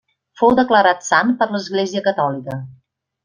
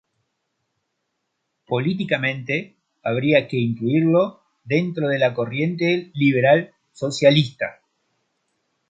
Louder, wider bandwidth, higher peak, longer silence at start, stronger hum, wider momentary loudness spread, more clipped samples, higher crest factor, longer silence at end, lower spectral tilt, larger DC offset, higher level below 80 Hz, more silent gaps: first, -17 LUFS vs -20 LUFS; about the same, 10 kHz vs 9.2 kHz; about the same, -2 dBFS vs -2 dBFS; second, 0.4 s vs 1.7 s; neither; about the same, 12 LU vs 10 LU; neither; about the same, 16 dB vs 20 dB; second, 0.5 s vs 1.15 s; second, -4.5 dB/octave vs -6.5 dB/octave; neither; first, -56 dBFS vs -64 dBFS; neither